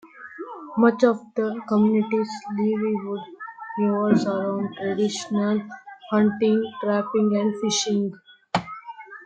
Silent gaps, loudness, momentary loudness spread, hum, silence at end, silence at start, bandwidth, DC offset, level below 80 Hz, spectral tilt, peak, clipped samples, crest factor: none; -23 LUFS; 17 LU; none; 0 s; 0.05 s; 8.8 kHz; under 0.1%; -68 dBFS; -5.5 dB/octave; -4 dBFS; under 0.1%; 20 dB